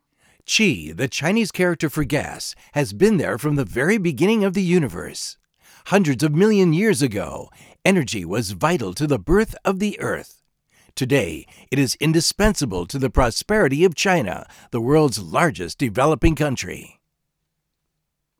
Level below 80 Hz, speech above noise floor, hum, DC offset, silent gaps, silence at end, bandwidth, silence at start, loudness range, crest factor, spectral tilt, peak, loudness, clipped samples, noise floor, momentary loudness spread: -36 dBFS; 57 dB; none; under 0.1%; none; 1.55 s; 20 kHz; 0.5 s; 3 LU; 18 dB; -5 dB/octave; -2 dBFS; -20 LUFS; under 0.1%; -77 dBFS; 11 LU